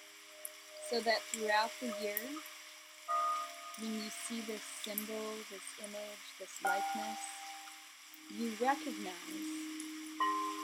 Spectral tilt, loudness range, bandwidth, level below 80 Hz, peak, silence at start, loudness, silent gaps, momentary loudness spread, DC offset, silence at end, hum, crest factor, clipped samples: -2 dB/octave; 5 LU; 18 kHz; under -90 dBFS; -16 dBFS; 0 s; -39 LUFS; none; 15 LU; under 0.1%; 0 s; none; 24 dB; under 0.1%